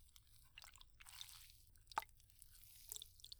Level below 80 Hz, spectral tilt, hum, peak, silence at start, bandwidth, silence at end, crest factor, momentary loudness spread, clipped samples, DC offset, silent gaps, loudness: -70 dBFS; -0.5 dB/octave; none; -26 dBFS; 0 s; over 20 kHz; 0 s; 30 dB; 16 LU; under 0.1%; under 0.1%; none; -55 LUFS